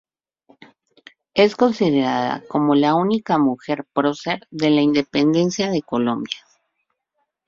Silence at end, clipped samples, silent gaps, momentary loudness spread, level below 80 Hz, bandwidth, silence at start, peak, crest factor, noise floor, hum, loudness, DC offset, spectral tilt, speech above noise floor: 1.1 s; under 0.1%; none; 9 LU; -60 dBFS; 7.6 kHz; 1.35 s; -2 dBFS; 18 dB; -74 dBFS; none; -19 LUFS; under 0.1%; -6 dB/octave; 56 dB